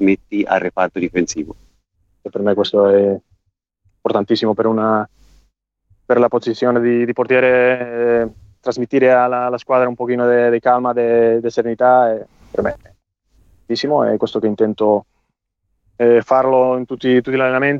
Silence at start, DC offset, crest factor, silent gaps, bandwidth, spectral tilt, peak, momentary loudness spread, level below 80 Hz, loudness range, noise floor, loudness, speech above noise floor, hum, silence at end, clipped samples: 0 s; under 0.1%; 14 dB; none; 7.4 kHz; -6 dB/octave; -2 dBFS; 11 LU; -54 dBFS; 4 LU; -71 dBFS; -16 LUFS; 56 dB; none; 0 s; under 0.1%